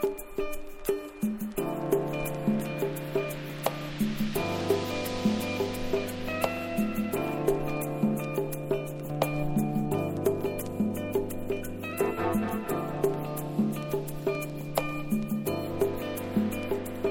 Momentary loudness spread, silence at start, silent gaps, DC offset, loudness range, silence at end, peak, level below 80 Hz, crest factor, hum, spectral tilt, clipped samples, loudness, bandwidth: 5 LU; 0 s; none; under 0.1%; 1 LU; 0 s; -10 dBFS; -48 dBFS; 20 dB; none; -6 dB/octave; under 0.1%; -31 LUFS; 18 kHz